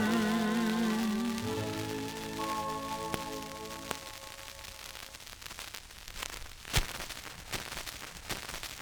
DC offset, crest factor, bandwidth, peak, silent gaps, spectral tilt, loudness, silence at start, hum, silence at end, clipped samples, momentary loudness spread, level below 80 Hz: under 0.1%; 26 dB; over 20 kHz; -10 dBFS; none; -4 dB/octave; -36 LUFS; 0 s; none; 0 s; under 0.1%; 14 LU; -50 dBFS